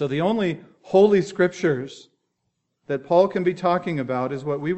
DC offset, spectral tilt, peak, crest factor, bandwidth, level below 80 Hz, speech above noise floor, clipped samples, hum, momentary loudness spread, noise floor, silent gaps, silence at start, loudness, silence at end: under 0.1%; -7 dB/octave; -4 dBFS; 18 dB; 8.2 kHz; -66 dBFS; 55 dB; under 0.1%; none; 11 LU; -76 dBFS; none; 0 s; -22 LUFS; 0 s